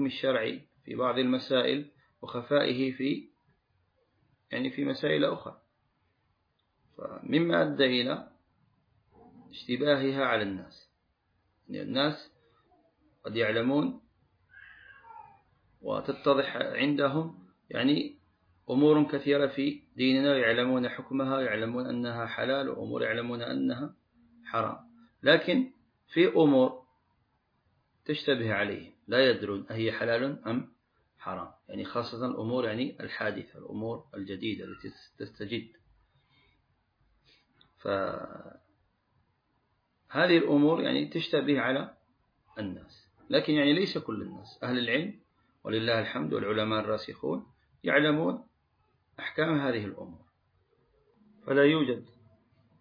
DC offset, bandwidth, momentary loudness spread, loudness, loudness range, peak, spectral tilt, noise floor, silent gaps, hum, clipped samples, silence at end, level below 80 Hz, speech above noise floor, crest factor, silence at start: under 0.1%; 5.2 kHz; 17 LU; -29 LUFS; 8 LU; -8 dBFS; -7.5 dB/octave; -75 dBFS; none; none; under 0.1%; 0.75 s; -72 dBFS; 46 dB; 22 dB; 0 s